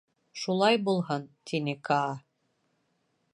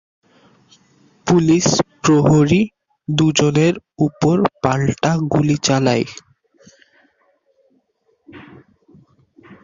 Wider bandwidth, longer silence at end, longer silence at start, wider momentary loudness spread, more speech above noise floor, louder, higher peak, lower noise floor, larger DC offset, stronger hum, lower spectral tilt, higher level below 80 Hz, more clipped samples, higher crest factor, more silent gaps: first, 11 kHz vs 7.6 kHz; first, 1.15 s vs 0.1 s; second, 0.35 s vs 1.25 s; first, 13 LU vs 9 LU; about the same, 46 dB vs 48 dB; second, -29 LUFS vs -16 LUFS; second, -10 dBFS vs -2 dBFS; first, -75 dBFS vs -63 dBFS; neither; neither; about the same, -5.5 dB/octave vs -5.5 dB/octave; second, -78 dBFS vs -48 dBFS; neither; about the same, 20 dB vs 16 dB; neither